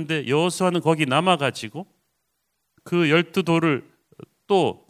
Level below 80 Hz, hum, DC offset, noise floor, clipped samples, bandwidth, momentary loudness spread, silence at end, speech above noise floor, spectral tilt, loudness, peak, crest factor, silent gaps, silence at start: -66 dBFS; none; under 0.1%; -75 dBFS; under 0.1%; 15.5 kHz; 9 LU; 0.15 s; 53 dB; -5.5 dB/octave; -21 LUFS; -4 dBFS; 20 dB; none; 0 s